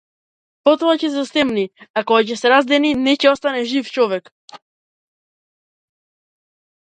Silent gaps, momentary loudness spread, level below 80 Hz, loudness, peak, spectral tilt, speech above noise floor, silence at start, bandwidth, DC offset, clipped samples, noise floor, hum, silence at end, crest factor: 1.90-1.94 s, 4.32-4.48 s; 7 LU; -60 dBFS; -17 LUFS; 0 dBFS; -4 dB/octave; over 74 dB; 0.65 s; 9.2 kHz; under 0.1%; under 0.1%; under -90 dBFS; none; 2.3 s; 18 dB